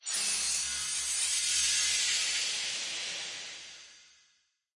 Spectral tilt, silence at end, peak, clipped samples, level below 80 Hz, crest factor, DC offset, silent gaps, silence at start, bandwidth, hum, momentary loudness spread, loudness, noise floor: 3 dB/octave; 0.75 s; -16 dBFS; under 0.1%; -66 dBFS; 18 dB; under 0.1%; none; 0.05 s; 11.5 kHz; none; 15 LU; -29 LUFS; -72 dBFS